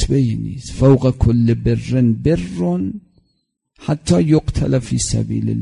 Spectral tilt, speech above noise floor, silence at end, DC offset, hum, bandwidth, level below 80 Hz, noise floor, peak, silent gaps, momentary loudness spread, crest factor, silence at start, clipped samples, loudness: -7 dB/octave; 52 dB; 0 s; under 0.1%; none; 11 kHz; -30 dBFS; -68 dBFS; -2 dBFS; none; 10 LU; 16 dB; 0 s; under 0.1%; -17 LUFS